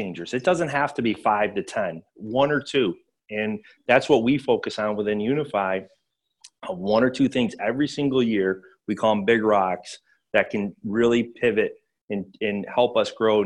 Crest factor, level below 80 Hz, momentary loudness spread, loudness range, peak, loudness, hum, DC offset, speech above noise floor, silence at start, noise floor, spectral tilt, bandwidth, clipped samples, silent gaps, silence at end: 18 dB; -60 dBFS; 12 LU; 2 LU; -6 dBFS; -23 LUFS; none; under 0.1%; 33 dB; 0 s; -55 dBFS; -6 dB/octave; 11 kHz; under 0.1%; 12.01-12.08 s; 0 s